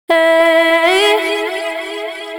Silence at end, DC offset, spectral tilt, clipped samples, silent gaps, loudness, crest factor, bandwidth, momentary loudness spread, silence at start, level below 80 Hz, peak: 0 s; under 0.1%; 0 dB/octave; under 0.1%; none; -12 LUFS; 12 dB; 18 kHz; 12 LU; 0.1 s; -62 dBFS; 0 dBFS